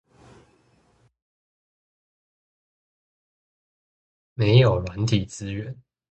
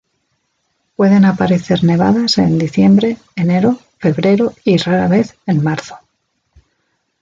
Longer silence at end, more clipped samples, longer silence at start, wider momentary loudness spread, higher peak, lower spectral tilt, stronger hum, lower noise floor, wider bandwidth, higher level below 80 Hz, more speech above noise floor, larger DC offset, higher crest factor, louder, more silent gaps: second, 0.4 s vs 1.25 s; neither; first, 4.4 s vs 1 s; first, 22 LU vs 8 LU; about the same, -4 dBFS vs -2 dBFS; about the same, -6.5 dB/octave vs -7 dB/octave; neither; about the same, -63 dBFS vs -66 dBFS; first, 8.6 kHz vs 7.6 kHz; about the same, -48 dBFS vs -48 dBFS; second, 42 dB vs 54 dB; neither; first, 24 dB vs 12 dB; second, -22 LUFS vs -13 LUFS; neither